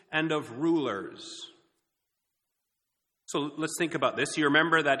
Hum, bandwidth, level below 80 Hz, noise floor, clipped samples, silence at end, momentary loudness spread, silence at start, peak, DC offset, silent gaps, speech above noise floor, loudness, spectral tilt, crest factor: none; 13.5 kHz; -76 dBFS; -83 dBFS; under 0.1%; 0 s; 18 LU; 0.1 s; -6 dBFS; under 0.1%; none; 55 dB; -28 LUFS; -4 dB/octave; 24 dB